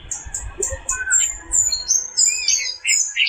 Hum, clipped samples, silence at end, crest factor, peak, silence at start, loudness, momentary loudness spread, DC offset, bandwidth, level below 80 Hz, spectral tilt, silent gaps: none; under 0.1%; 0 s; 18 dB; -4 dBFS; 0 s; -17 LUFS; 10 LU; under 0.1%; 16 kHz; -40 dBFS; 1.5 dB/octave; none